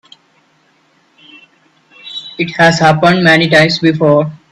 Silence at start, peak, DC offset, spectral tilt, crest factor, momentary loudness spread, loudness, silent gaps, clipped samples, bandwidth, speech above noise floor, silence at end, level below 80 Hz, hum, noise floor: 2.05 s; 0 dBFS; under 0.1%; -5.5 dB/octave; 12 dB; 16 LU; -9 LUFS; none; under 0.1%; 12 kHz; 44 dB; 0.15 s; -50 dBFS; none; -54 dBFS